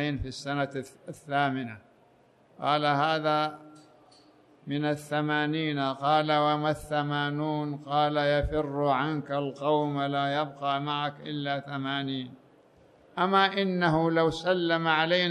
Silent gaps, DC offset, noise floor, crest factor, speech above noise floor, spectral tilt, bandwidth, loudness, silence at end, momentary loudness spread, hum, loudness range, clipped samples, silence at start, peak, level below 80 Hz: none; under 0.1%; -61 dBFS; 18 dB; 34 dB; -6 dB/octave; 12.5 kHz; -28 LUFS; 0 s; 10 LU; none; 3 LU; under 0.1%; 0 s; -10 dBFS; -52 dBFS